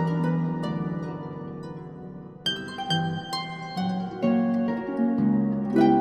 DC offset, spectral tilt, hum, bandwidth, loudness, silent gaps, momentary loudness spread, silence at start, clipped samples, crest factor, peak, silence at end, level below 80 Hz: under 0.1%; -7 dB/octave; none; 13.5 kHz; -27 LUFS; none; 14 LU; 0 s; under 0.1%; 18 dB; -8 dBFS; 0 s; -58 dBFS